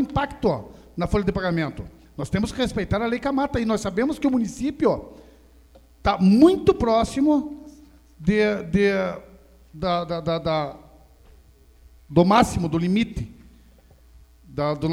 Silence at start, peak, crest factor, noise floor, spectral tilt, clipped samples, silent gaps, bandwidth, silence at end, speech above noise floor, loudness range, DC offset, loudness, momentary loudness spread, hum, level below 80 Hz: 0 s; -4 dBFS; 20 dB; -52 dBFS; -6.5 dB/octave; under 0.1%; none; 13.5 kHz; 0 s; 31 dB; 5 LU; under 0.1%; -22 LUFS; 13 LU; none; -42 dBFS